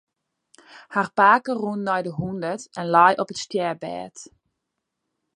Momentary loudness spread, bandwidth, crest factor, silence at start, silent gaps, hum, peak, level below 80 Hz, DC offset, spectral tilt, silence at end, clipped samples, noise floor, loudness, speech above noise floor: 14 LU; 11.5 kHz; 22 dB; 0.75 s; none; none; -2 dBFS; -64 dBFS; under 0.1%; -5 dB/octave; 1.1 s; under 0.1%; -80 dBFS; -22 LUFS; 58 dB